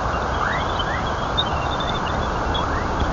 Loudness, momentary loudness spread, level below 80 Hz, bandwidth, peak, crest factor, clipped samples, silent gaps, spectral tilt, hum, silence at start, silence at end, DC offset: -22 LUFS; 2 LU; -30 dBFS; 7.6 kHz; -8 dBFS; 14 dB; under 0.1%; none; -5 dB/octave; none; 0 s; 0 s; under 0.1%